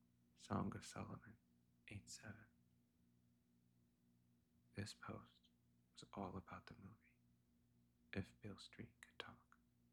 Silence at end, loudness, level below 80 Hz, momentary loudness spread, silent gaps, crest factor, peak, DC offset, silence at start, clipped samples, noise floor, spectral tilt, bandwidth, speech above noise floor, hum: 0.5 s; -55 LUFS; -78 dBFS; 16 LU; none; 26 dB; -30 dBFS; under 0.1%; 0.35 s; under 0.1%; -79 dBFS; -5 dB/octave; 12 kHz; 26 dB; 60 Hz at -75 dBFS